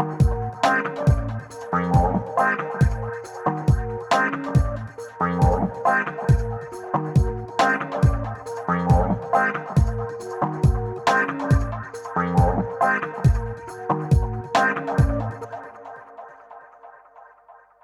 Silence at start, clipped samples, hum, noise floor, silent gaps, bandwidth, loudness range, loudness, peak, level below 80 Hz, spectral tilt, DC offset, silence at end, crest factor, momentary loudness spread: 0 s; under 0.1%; none; -51 dBFS; none; 12 kHz; 3 LU; -22 LUFS; -6 dBFS; -30 dBFS; -7 dB/octave; under 0.1%; 0.3 s; 16 dB; 12 LU